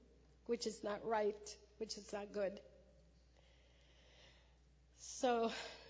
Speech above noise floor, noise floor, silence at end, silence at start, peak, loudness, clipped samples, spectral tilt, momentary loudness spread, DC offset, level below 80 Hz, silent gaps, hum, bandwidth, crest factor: 27 dB; -69 dBFS; 0 s; 0 s; -26 dBFS; -43 LUFS; under 0.1%; -3.5 dB/octave; 17 LU; under 0.1%; -70 dBFS; none; none; 8 kHz; 20 dB